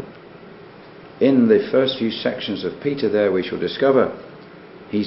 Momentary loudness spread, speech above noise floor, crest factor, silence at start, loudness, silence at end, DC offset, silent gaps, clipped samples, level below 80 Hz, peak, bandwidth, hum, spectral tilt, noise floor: 11 LU; 23 dB; 18 dB; 0 s; -19 LUFS; 0 s; under 0.1%; none; under 0.1%; -58 dBFS; -2 dBFS; 5.8 kHz; none; -10.5 dB/octave; -42 dBFS